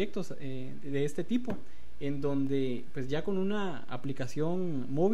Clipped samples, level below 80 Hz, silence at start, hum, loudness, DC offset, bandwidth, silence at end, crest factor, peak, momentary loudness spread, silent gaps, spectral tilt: under 0.1%; -60 dBFS; 0 s; none; -35 LUFS; 3%; 13 kHz; 0 s; 16 dB; -16 dBFS; 9 LU; none; -7 dB/octave